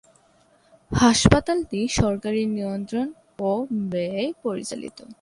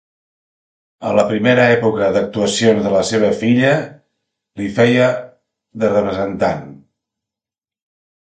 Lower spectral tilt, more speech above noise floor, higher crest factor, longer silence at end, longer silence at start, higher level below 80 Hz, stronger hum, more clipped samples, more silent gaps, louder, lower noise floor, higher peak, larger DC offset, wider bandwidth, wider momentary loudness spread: about the same, -5 dB/octave vs -5.5 dB/octave; second, 37 dB vs 75 dB; first, 22 dB vs 16 dB; second, 0.1 s vs 1.5 s; about the same, 0.9 s vs 1 s; first, -40 dBFS vs -50 dBFS; neither; neither; neither; second, -23 LUFS vs -15 LUFS; second, -59 dBFS vs -90 dBFS; about the same, -2 dBFS vs 0 dBFS; neither; first, 11.5 kHz vs 9.4 kHz; first, 13 LU vs 10 LU